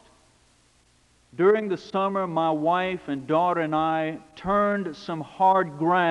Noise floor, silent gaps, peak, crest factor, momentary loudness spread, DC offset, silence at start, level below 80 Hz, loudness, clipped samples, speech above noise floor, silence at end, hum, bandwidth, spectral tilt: -61 dBFS; none; -8 dBFS; 16 dB; 11 LU; under 0.1%; 1.35 s; -60 dBFS; -24 LUFS; under 0.1%; 38 dB; 0 s; 60 Hz at -65 dBFS; 11 kHz; -7 dB/octave